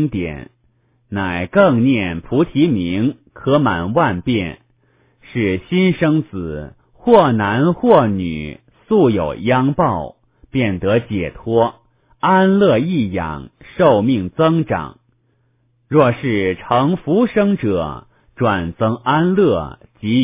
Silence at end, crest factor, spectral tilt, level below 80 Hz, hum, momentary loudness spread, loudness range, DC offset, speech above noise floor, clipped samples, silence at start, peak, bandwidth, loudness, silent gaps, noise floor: 0 s; 16 dB; -11.5 dB/octave; -42 dBFS; none; 14 LU; 3 LU; under 0.1%; 45 dB; under 0.1%; 0 s; 0 dBFS; 4 kHz; -16 LUFS; none; -61 dBFS